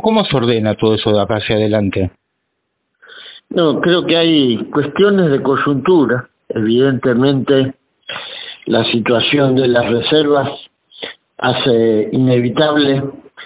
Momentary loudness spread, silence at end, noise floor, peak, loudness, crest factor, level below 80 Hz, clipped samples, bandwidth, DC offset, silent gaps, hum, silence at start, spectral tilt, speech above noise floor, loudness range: 14 LU; 0 s; -70 dBFS; 0 dBFS; -14 LUFS; 14 dB; -46 dBFS; under 0.1%; 4 kHz; under 0.1%; none; none; 0.05 s; -10.5 dB/octave; 57 dB; 3 LU